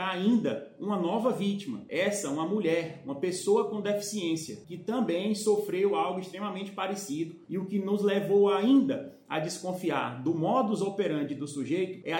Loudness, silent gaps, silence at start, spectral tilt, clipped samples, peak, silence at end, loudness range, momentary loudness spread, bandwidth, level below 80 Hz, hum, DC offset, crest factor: -29 LUFS; none; 0 s; -5.5 dB/octave; under 0.1%; -14 dBFS; 0 s; 3 LU; 11 LU; 17 kHz; -78 dBFS; none; under 0.1%; 14 dB